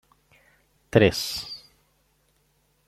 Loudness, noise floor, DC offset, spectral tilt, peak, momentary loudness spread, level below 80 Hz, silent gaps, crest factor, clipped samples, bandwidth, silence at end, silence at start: -23 LUFS; -67 dBFS; under 0.1%; -5 dB/octave; -2 dBFS; 19 LU; -54 dBFS; none; 26 dB; under 0.1%; 16 kHz; 1.3 s; 0.95 s